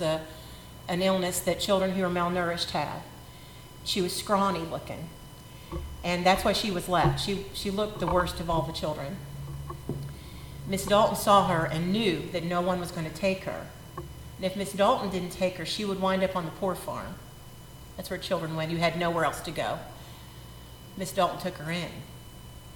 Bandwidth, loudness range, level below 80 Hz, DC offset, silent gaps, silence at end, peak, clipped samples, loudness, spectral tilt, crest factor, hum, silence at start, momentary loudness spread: 17.5 kHz; 5 LU; -48 dBFS; under 0.1%; none; 0 s; -8 dBFS; under 0.1%; -28 LUFS; -5 dB/octave; 22 dB; none; 0 s; 20 LU